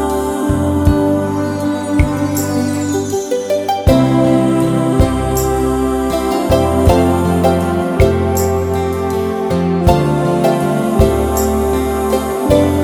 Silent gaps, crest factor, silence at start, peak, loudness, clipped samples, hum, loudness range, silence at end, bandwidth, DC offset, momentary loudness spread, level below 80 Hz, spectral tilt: none; 14 dB; 0 s; 0 dBFS; -14 LUFS; under 0.1%; none; 2 LU; 0 s; 19.5 kHz; under 0.1%; 5 LU; -24 dBFS; -6.5 dB/octave